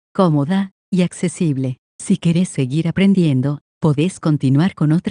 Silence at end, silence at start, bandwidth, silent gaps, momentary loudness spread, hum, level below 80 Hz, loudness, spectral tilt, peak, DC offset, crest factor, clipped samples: 0 s; 0.15 s; 10.5 kHz; 0.71-0.92 s, 1.78-1.99 s, 3.61-3.81 s; 6 LU; none; -54 dBFS; -18 LUFS; -7 dB/octave; -2 dBFS; under 0.1%; 16 dB; under 0.1%